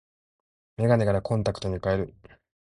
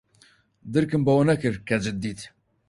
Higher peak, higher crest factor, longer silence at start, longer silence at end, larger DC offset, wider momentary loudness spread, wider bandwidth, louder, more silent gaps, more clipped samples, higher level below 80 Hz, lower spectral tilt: about the same, -8 dBFS vs -8 dBFS; about the same, 20 dB vs 16 dB; first, 0.8 s vs 0.65 s; first, 0.55 s vs 0.4 s; neither; second, 10 LU vs 15 LU; about the same, 11 kHz vs 11.5 kHz; about the same, -26 LUFS vs -24 LUFS; neither; neither; first, -46 dBFS vs -54 dBFS; about the same, -7.5 dB/octave vs -7 dB/octave